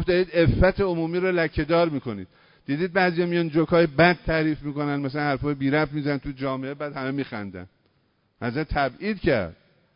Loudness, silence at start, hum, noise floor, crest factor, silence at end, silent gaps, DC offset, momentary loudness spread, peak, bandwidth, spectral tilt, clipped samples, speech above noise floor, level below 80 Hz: -24 LUFS; 0 s; none; -67 dBFS; 18 dB; 0.45 s; none; under 0.1%; 12 LU; -6 dBFS; 5.4 kHz; -11 dB/octave; under 0.1%; 44 dB; -40 dBFS